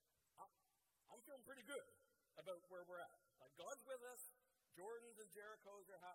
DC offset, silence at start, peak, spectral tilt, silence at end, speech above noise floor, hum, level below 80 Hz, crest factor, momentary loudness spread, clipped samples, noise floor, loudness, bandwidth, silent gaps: under 0.1%; 0.35 s; -40 dBFS; -2 dB/octave; 0 s; 28 dB; none; under -90 dBFS; 20 dB; 12 LU; under 0.1%; -86 dBFS; -59 LUFS; 16.5 kHz; none